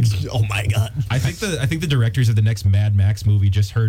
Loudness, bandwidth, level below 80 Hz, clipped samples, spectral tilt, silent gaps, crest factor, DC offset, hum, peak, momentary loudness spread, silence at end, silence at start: -19 LUFS; 15 kHz; -38 dBFS; under 0.1%; -6 dB/octave; none; 8 dB; under 0.1%; none; -8 dBFS; 4 LU; 0 s; 0 s